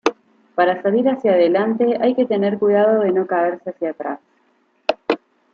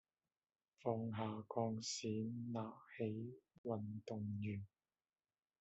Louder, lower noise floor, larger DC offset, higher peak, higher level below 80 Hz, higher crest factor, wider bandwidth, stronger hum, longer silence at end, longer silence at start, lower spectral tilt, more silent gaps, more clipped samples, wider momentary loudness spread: first, -18 LUFS vs -46 LUFS; second, -61 dBFS vs under -90 dBFS; neither; first, -2 dBFS vs -26 dBFS; first, -68 dBFS vs -84 dBFS; about the same, 16 dB vs 20 dB; second, 6.8 kHz vs 7.6 kHz; neither; second, 0.4 s vs 0.95 s; second, 0.05 s vs 0.85 s; about the same, -6.5 dB/octave vs -6.5 dB/octave; second, none vs 3.58-3.64 s; neither; first, 11 LU vs 8 LU